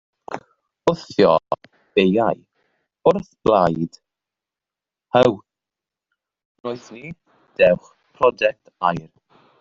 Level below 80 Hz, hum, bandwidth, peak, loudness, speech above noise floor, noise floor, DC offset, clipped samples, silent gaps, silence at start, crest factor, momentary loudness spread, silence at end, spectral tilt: -56 dBFS; none; 7.6 kHz; -2 dBFS; -19 LUFS; 70 dB; -88 dBFS; under 0.1%; under 0.1%; 6.45-6.55 s; 0.3 s; 20 dB; 18 LU; 0.6 s; -6.5 dB/octave